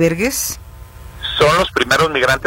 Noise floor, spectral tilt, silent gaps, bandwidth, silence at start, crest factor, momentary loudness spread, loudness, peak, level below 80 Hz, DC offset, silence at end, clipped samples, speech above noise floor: -35 dBFS; -3.5 dB/octave; none; 16.5 kHz; 0 s; 16 dB; 11 LU; -15 LUFS; 0 dBFS; -36 dBFS; under 0.1%; 0 s; under 0.1%; 20 dB